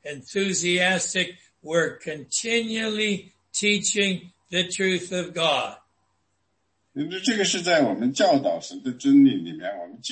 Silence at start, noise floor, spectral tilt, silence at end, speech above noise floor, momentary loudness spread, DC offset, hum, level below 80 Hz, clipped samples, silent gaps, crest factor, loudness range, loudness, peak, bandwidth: 0.05 s; -73 dBFS; -3 dB/octave; 0 s; 50 dB; 12 LU; under 0.1%; none; -70 dBFS; under 0.1%; none; 18 dB; 4 LU; -23 LUFS; -6 dBFS; 8.8 kHz